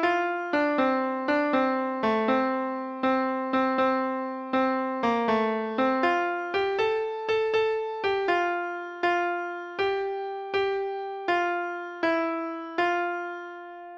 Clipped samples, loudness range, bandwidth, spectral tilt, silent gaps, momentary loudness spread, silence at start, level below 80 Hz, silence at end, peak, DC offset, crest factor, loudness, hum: under 0.1%; 3 LU; 7.4 kHz; -5 dB/octave; none; 8 LU; 0 s; -66 dBFS; 0 s; -12 dBFS; under 0.1%; 16 dB; -27 LUFS; none